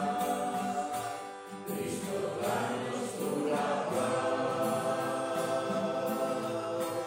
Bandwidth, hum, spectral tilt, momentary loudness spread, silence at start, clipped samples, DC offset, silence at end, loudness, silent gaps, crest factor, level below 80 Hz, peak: 16 kHz; none; -4.5 dB/octave; 5 LU; 0 s; under 0.1%; under 0.1%; 0 s; -33 LUFS; none; 14 dB; -72 dBFS; -18 dBFS